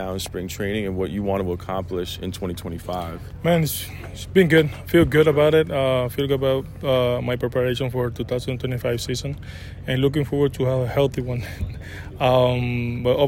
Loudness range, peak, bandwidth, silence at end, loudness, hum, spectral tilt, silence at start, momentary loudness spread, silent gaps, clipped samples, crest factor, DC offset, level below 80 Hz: 6 LU; -4 dBFS; 16.5 kHz; 0 s; -22 LUFS; none; -6 dB/octave; 0 s; 13 LU; none; under 0.1%; 18 dB; under 0.1%; -42 dBFS